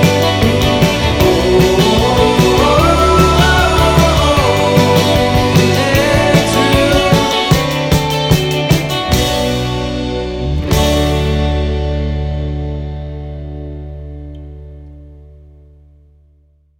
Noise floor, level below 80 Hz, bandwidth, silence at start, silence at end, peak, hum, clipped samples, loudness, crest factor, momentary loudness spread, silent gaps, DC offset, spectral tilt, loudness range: -51 dBFS; -22 dBFS; 19 kHz; 0 s; 1.5 s; 0 dBFS; none; under 0.1%; -12 LUFS; 12 dB; 16 LU; none; under 0.1%; -5 dB/octave; 14 LU